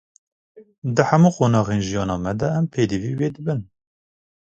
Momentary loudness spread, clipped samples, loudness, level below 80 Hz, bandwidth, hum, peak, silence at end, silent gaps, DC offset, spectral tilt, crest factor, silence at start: 11 LU; under 0.1%; -21 LUFS; -48 dBFS; 8 kHz; none; 0 dBFS; 0.95 s; 0.78-0.82 s; under 0.1%; -7 dB/octave; 20 dB; 0.55 s